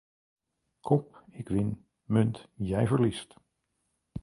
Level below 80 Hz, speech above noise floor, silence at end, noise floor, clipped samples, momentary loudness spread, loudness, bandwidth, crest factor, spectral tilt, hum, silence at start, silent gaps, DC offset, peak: -54 dBFS; 51 dB; 0 s; -79 dBFS; under 0.1%; 18 LU; -29 LUFS; 11.5 kHz; 20 dB; -8 dB/octave; none; 0.85 s; none; under 0.1%; -12 dBFS